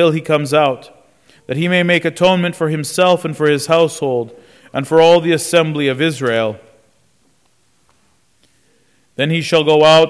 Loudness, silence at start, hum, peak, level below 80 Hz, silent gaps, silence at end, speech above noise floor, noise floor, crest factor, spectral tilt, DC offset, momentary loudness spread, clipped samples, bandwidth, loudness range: -14 LUFS; 0 s; none; -2 dBFS; -56 dBFS; none; 0 s; 46 dB; -59 dBFS; 14 dB; -5 dB/octave; under 0.1%; 12 LU; under 0.1%; 11 kHz; 8 LU